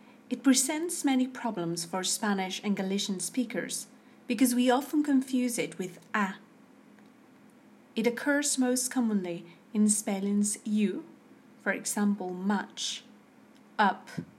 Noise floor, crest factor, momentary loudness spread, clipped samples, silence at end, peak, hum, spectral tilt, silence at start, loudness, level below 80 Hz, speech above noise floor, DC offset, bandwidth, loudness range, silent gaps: -57 dBFS; 20 dB; 10 LU; under 0.1%; 0.1 s; -12 dBFS; none; -3.5 dB/octave; 0.3 s; -29 LUFS; -82 dBFS; 28 dB; under 0.1%; 16 kHz; 4 LU; none